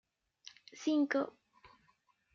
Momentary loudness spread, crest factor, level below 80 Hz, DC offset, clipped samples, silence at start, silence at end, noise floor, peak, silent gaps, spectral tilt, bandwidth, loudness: 24 LU; 18 dB; -84 dBFS; under 0.1%; under 0.1%; 0.75 s; 1.05 s; -74 dBFS; -20 dBFS; none; -3.5 dB/octave; 7.4 kHz; -35 LUFS